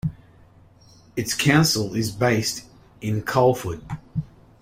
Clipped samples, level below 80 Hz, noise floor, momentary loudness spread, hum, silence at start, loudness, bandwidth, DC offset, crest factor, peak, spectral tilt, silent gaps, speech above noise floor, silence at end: under 0.1%; -50 dBFS; -52 dBFS; 15 LU; none; 0.05 s; -22 LUFS; 16 kHz; under 0.1%; 20 dB; -4 dBFS; -4.5 dB/octave; none; 30 dB; 0.35 s